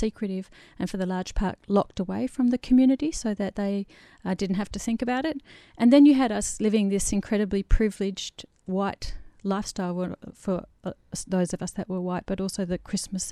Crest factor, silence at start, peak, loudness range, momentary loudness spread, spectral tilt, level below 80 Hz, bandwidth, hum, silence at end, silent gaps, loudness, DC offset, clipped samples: 20 dB; 0 s; -6 dBFS; 8 LU; 15 LU; -5.5 dB/octave; -38 dBFS; 14 kHz; none; 0 s; none; -26 LUFS; under 0.1%; under 0.1%